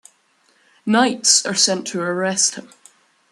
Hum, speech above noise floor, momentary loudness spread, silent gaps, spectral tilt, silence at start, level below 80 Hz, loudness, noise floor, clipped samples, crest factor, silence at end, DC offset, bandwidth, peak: none; 41 dB; 10 LU; none; -1.5 dB/octave; 0.85 s; -70 dBFS; -17 LUFS; -60 dBFS; under 0.1%; 20 dB; 0.7 s; under 0.1%; 12.5 kHz; 0 dBFS